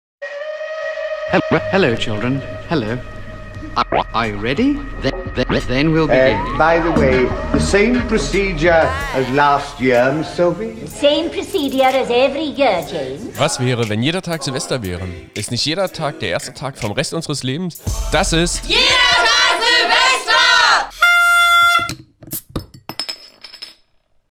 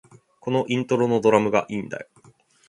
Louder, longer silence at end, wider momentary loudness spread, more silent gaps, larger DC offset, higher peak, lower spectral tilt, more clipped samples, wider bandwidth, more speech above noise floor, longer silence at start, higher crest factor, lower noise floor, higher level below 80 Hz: first, -15 LUFS vs -22 LUFS; about the same, 0.6 s vs 0.65 s; about the same, 16 LU vs 17 LU; neither; neither; first, 0 dBFS vs -4 dBFS; second, -4 dB/octave vs -6.5 dB/octave; neither; first, 19.5 kHz vs 11 kHz; first, 40 dB vs 34 dB; second, 0.2 s vs 0.45 s; about the same, 16 dB vs 20 dB; about the same, -57 dBFS vs -56 dBFS; first, -32 dBFS vs -64 dBFS